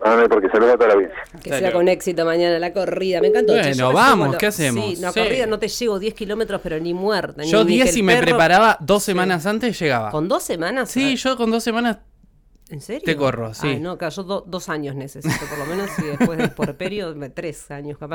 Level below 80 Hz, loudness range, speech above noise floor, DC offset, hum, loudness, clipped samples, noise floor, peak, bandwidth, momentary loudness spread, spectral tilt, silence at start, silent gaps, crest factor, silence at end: -46 dBFS; 8 LU; 33 dB; under 0.1%; none; -19 LUFS; under 0.1%; -52 dBFS; -4 dBFS; 19 kHz; 13 LU; -4.5 dB/octave; 0 s; none; 14 dB; 0 s